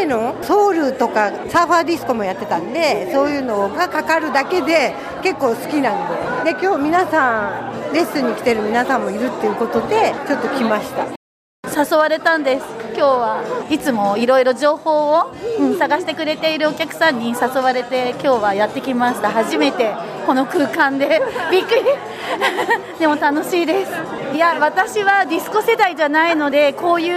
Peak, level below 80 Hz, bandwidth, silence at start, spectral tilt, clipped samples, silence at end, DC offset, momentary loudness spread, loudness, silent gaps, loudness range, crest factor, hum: -2 dBFS; -56 dBFS; 15.5 kHz; 0 s; -4 dB/octave; under 0.1%; 0 s; under 0.1%; 6 LU; -17 LUFS; 11.16-11.63 s; 2 LU; 14 dB; none